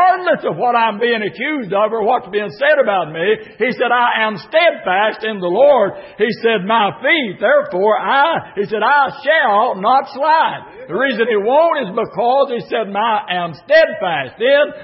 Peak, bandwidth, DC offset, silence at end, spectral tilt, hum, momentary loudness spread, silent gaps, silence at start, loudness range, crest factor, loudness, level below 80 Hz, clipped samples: 0 dBFS; 5.8 kHz; under 0.1%; 0 s; -9 dB/octave; none; 7 LU; none; 0 s; 2 LU; 14 dB; -15 LUFS; -62 dBFS; under 0.1%